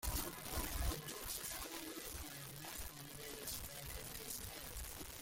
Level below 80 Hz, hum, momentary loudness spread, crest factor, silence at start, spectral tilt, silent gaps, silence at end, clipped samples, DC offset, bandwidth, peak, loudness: -52 dBFS; none; 6 LU; 22 dB; 0 s; -2.5 dB/octave; none; 0 s; under 0.1%; under 0.1%; 17 kHz; -24 dBFS; -46 LUFS